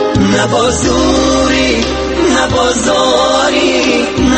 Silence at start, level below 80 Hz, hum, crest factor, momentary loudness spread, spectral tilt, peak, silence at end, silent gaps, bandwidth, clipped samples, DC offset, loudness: 0 s; -26 dBFS; none; 10 dB; 2 LU; -4 dB/octave; 0 dBFS; 0 s; none; 8.8 kHz; under 0.1%; under 0.1%; -11 LUFS